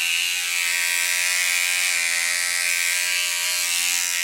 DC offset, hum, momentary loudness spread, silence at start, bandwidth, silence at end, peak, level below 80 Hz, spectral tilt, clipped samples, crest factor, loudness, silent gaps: under 0.1%; none; 2 LU; 0 s; 16.5 kHz; 0 s; -6 dBFS; -74 dBFS; 4.5 dB/octave; under 0.1%; 16 dB; -19 LUFS; none